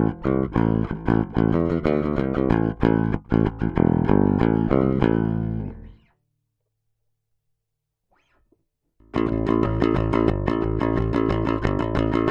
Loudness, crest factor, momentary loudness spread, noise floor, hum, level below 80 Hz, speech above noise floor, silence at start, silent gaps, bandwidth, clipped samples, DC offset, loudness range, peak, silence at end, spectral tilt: -22 LUFS; 20 dB; 5 LU; -80 dBFS; none; -34 dBFS; 59 dB; 0 s; none; 7 kHz; under 0.1%; under 0.1%; 10 LU; -2 dBFS; 0 s; -10 dB/octave